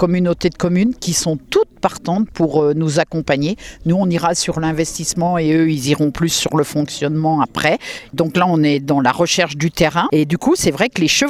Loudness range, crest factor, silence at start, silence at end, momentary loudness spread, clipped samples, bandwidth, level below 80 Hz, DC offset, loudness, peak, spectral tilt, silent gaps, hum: 2 LU; 16 dB; 0 s; 0 s; 5 LU; under 0.1%; 16 kHz; -44 dBFS; under 0.1%; -17 LUFS; 0 dBFS; -4.5 dB/octave; none; none